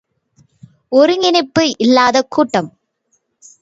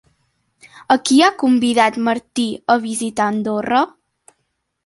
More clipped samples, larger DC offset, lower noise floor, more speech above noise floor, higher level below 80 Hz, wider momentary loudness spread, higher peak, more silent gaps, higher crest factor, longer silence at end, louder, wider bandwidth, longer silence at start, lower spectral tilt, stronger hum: neither; neither; second, -65 dBFS vs -71 dBFS; about the same, 52 dB vs 55 dB; about the same, -58 dBFS vs -62 dBFS; about the same, 6 LU vs 8 LU; about the same, 0 dBFS vs 0 dBFS; neither; about the same, 16 dB vs 18 dB; about the same, 0.95 s vs 0.95 s; first, -13 LUFS vs -17 LUFS; second, 8 kHz vs 11.5 kHz; first, 0.9 s vs 0.75 s; about the same, -4 dB/octave vs -3.5 dB/octave; neither